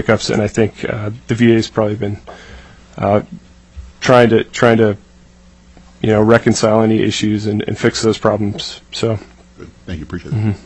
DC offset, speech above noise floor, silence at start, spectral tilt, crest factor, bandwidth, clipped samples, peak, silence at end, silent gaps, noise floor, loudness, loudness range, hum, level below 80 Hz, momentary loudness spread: under 0.1%; 30 dB; 0 s; -6 dB/octave; 16 dB; 9.4 kHz; under 0.1%; 0 dBFS; 0.1 s; none; -44 dBFS; -15 LUFS; 4 LU; none; -42 dBFS; 15 LU